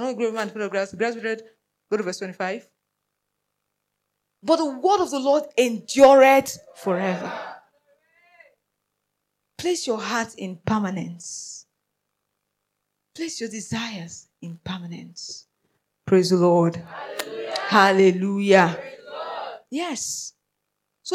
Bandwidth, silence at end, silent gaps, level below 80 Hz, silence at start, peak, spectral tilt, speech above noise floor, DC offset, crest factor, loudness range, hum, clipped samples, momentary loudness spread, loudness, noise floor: 15 kHz; 0 s; none; -64 dBFS; 0 s; -2 dBFS; -4.5 dB/octave; 57 dB; under 0.1%; 20 dB; 14 LU; 50 Hz at -55 dBFS; under 0.1%; 19 LU; -22 LUFS; -79 dBFS